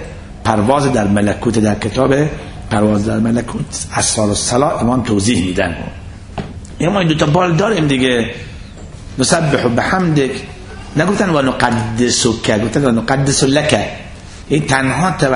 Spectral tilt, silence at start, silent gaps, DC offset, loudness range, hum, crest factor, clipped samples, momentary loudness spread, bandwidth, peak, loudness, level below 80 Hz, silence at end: -5 dB/octave; 0 s; none; under 0.1%; 2 LU; none; 14 dB; under 0.1%; 16 LU; 11 kHz; 0 dBFS; -14 LUFS; -34 dBFS; 0 s